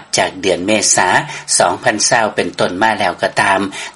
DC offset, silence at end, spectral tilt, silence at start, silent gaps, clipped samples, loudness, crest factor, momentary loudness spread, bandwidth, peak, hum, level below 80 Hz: under 0.1%; 0.05 s; -2 dB/octave; 0 s; none; under 0.1%; -13 LUFS; 14 dB; 6 LU; over 20 kHz; 0 dBFS; none; -54 dBFS